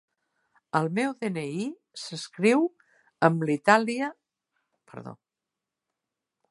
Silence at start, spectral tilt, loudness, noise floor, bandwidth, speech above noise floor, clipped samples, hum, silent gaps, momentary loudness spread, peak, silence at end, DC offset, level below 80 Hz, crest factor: 0.75 s; -5.5 dB/octave; -26 LUFS; -88 dBFS; 11.5 kHz; 62 dB; under 0.1%; none; none; 22 LU; -4 dBFS; 1.35 s; under 0.1%; -76 dBFS; 26 dB